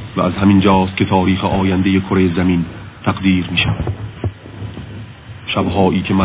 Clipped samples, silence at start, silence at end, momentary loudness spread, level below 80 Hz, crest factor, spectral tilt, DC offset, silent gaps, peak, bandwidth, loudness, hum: under 0.1%; 0 s; 0 s; 18 LU; -32 dBFS; 16 dB; -11 dB/octave; under 0.1%; none; 0 dBFS; 4 kHz; -15 LUFS; none